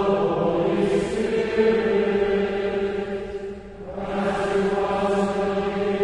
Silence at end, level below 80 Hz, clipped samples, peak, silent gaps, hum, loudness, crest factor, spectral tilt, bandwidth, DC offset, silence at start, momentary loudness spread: 0 s; -46 dBFS; under 0.1%; -8 dBFS; none; none; -23 LUFS; 14 dB; -6.5 dB/octave; 10.5 kHz; under 0.1%; 0 s; 10 LU